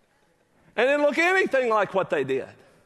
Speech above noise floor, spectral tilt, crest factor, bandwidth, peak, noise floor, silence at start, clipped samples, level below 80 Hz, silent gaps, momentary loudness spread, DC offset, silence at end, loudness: 42 dB; -4.5 dB/octave; 18 dB; 12 kHz; -8 dBFS; -65 dBFS; 0.75 s; under 0.1%; -72 dBFS; none; 10 LU; under 0.1%; 0.35 s; -23 LUFS